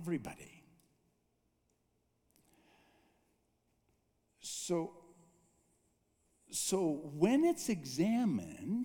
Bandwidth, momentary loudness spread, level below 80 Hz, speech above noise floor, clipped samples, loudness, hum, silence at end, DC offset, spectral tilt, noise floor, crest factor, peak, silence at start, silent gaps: 19 kHz; 15 LU; -74 dBFS; 44 dB; under 0.1%; -35 LUFS; none; 0 s; under 0.1%; -5 dB/octave; -79 dBFS; 22 dB; -16 dBFS; 0 s; none